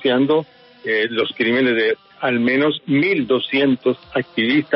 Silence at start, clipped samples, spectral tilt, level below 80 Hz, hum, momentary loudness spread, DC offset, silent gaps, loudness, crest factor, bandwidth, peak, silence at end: 0 s; under 0.1%; -3 dB/octave; -62 dBFS; none; 6 LU; under 0.1%; none; -18 LUFS; 14 dB; 5.8 kHz; -4 dBFS; 0 s